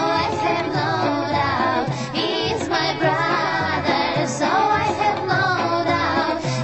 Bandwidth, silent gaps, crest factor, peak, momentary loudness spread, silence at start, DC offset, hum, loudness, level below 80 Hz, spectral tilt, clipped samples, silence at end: 8.4 kHz; none; 14 dB; -6 dBFS; 3 LU; 0 s; 0.2%; none; -20 LUFS; -52 dBFS; -5 dB/octave; under 0.1%; 0 s